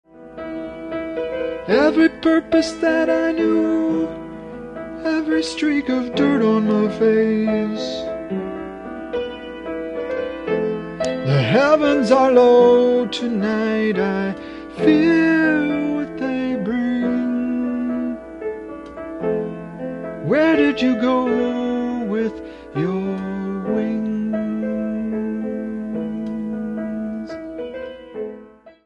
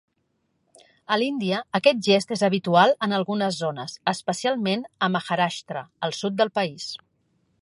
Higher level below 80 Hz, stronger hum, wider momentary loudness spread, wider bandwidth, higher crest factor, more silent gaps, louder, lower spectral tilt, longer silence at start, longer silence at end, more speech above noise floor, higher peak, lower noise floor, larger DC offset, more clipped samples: first, -50 dBFS vs -72 dBFS; neither; first, 16 LU vs 11 LU; second, 10 kHz vs 11.5 kHz; about the same, 16 dB vs 20 dB; neither; first, -20 LUFS vs -23 LUFS; first, -6.5 dB/octave vs -5 dB/octave; second, 0.15 s vs 1.1 s; second, 0.15 s vs 0.65 s; second, 27 dB vs 49 dB; about the same, -2 dBFS vs -4 dBFS; second, -43 dBFS vs -72 dBFS; neither; neither